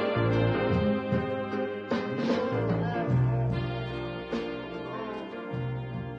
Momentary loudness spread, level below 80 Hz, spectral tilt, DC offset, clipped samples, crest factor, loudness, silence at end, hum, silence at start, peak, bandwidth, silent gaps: 10 LU; -50 dBFS; -8.5 dB/octave; under 0.1%; under 0.1%; 14 dB; -30 LUFS; 0 s; none; 0 s; -14 dBFS; 7 kHz; none